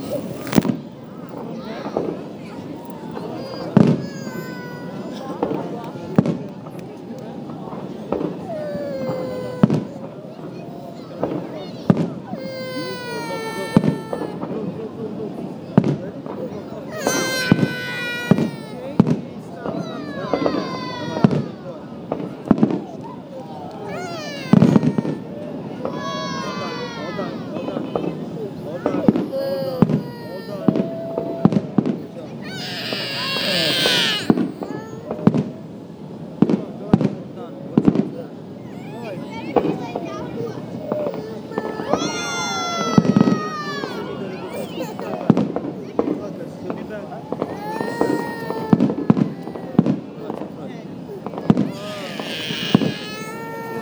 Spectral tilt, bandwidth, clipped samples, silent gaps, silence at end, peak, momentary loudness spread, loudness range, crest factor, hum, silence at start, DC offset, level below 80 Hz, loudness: -6 dB/octave; over 20 kHz; under 0.1%; none; 0 s; 0 dBFS; 15 LU; 6 LU; 22 dB; none; 0 s; under 0.1%; -54 dBFS; -23 LUFS